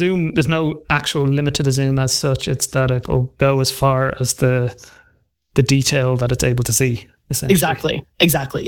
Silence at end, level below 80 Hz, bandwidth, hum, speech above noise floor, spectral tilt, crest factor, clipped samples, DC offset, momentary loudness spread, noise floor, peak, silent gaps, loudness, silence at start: 0 s; -40 dBFS; 19 kHz; none; 42 dB; -4.5 dB/octave; 16 dB; under 0.1%; under 0.1%; 5 LU; -59 dBFS; -2 dBFS; none; -18 LUFS; 0 s